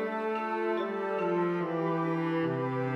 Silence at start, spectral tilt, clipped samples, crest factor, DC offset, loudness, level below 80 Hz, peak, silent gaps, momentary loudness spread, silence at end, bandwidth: 0 s; -8.5 dB/octave; under 0.1%; 12 dB; under 0.1%; -31 LUFS; -80 dBFS; -18 dBFS; none; 2 LU; 0 s; 6.4 kHz